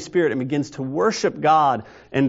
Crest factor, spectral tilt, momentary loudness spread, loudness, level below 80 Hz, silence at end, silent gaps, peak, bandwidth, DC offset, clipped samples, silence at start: 14 dB; -5 dB/octave; 10 LU; -21 LUFS; -60 dBFS; 0 s; none; -6 dBFS; 8 kHz; under 0.1%; under 0.1%; 0 s